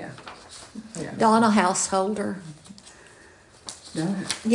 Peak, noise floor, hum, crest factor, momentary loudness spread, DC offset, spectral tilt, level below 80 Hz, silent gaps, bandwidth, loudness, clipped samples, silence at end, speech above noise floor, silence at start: -6 dBFS; -52 dBFS; none; 20 dB; 23 LU; under 0.1%; -4 dB/octave; -62 dBFS; none; 11 kHz; -23 LUFS; under 0.1%; 0 s; 29 dB; 0 s